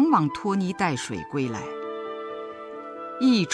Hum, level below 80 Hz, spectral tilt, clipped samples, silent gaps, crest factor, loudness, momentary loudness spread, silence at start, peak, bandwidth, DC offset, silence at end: none; -62 dBFS; -5.5 dB/octave; under 0.1%; none; 20 dB; -27 LUFS; 15 LU; 0 s; -6 dBFS; 11 kHz; under 0.1%; 0 s